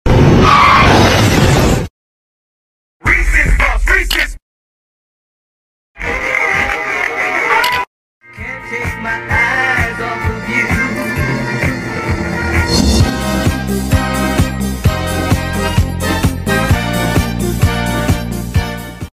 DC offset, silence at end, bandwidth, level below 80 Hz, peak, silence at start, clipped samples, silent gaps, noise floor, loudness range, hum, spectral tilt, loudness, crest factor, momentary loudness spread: under 0.1%; 0.05 s; 16 kHz; -22 dBFS; 0 dBFS; 0.05 s; under 0.1%; 1.90-3.00 s, 4.42-5.95 s, 7.87-8.21 s; under -90 dBFS; 4 LU; none; -5 dB/octave; -13 LUFS; 14 dB; 10 LU